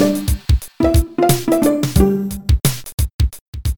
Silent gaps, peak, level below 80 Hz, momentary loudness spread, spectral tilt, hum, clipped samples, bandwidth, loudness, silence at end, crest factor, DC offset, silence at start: 2.94-2.98 s, 3.14-3.19 s, 3.41-3.53 s; 0 dBFS; -22 dBFS; 7 LU; -6 dB/octave; none; under 0.1%; over 20 kHz; -17 LUFS; 0 s; 16 dB; under 0.1%; 0 s